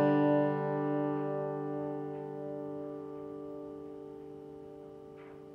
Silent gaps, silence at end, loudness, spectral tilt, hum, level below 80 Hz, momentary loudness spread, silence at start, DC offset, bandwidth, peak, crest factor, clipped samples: none; 0 s; -35 LUFS; -10 dB/octave; none; -74 dBFS; 20 LU; 0 s; under 0.1%; 5 kHz; -18 dBFS; 16 dB; under 0.1%